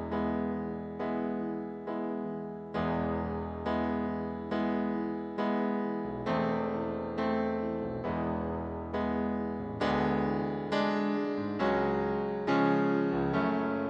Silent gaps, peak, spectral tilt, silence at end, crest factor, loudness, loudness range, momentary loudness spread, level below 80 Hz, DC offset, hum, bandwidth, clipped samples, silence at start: none; -16 dBFS; -8 dB/octave; 0 s; 16 dB; -32 LUFS; 4 LU; 7 LU; -52 dBFS; under 0.1%; none; 8 kHz; under 0.1%; 0 s